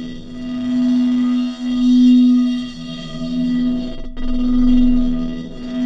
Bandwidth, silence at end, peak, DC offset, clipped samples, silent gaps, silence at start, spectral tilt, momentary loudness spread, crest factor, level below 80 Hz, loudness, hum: 7.4 kHz; 0 s; -4 dBFS; under 0.1%; under 0.1%; none; 0 s; -6.5 dB/octave; 17 LU; 12 dB; -26 dBFS; -17 LUFS; none